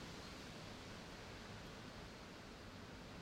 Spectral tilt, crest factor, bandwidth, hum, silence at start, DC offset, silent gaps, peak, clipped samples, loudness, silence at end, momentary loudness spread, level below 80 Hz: -4.5 dB/octave; 14 dB; 16 kHz; none; 0 s; under 0.1%; none; -40 dBFS; under 0.1%; -54 LUFS; 0 s; 2 LU; -64 dBFS